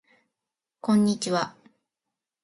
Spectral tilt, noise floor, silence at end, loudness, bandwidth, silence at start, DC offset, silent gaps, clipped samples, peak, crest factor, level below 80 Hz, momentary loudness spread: -5.5 dB/octave; -87 dBFS; 0.95 s; -25 LUFS; 11.5 kHz; 0.85 s; under 0.1%; none; under 0.1%; -12 dBFS; 18 dB; -70 dBFS; 12 LU